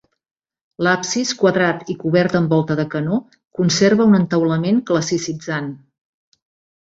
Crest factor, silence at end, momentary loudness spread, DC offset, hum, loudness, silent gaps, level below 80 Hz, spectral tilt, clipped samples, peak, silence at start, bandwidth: 16 dB; 1.05 s; 10 LU; under 0.1%; none; -18 LUFS; 3.47-3.51 s; -58 dBFS; -5.5 dB/octave; under 0.1%; -2 dBFS; 0.8 s; 8 kHz